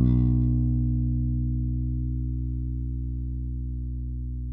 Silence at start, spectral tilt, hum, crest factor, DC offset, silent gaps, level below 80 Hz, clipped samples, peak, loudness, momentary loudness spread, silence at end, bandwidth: 0 s; -13.5 dB/octave; 60 Hz at -75 dBFS; 14 dB; under 0.1%; none; -30 dBFS; under 0.1%; -12 dBFS; -28 LUFS; 10 LU; 0 s; 1.2 kHz